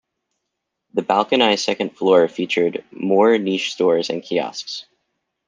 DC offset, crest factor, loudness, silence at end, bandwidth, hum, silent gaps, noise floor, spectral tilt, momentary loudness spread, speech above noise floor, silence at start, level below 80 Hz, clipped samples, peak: under 0.1%; 18 dB; -19 LUFS; 0.65 s; 9.6 kHz; none; none; -78 dBFS; -4.5 dB/octave; 11 LU; 60 dB; 0.95 s; -68 dBFS; under 0.1%; 0 dBFS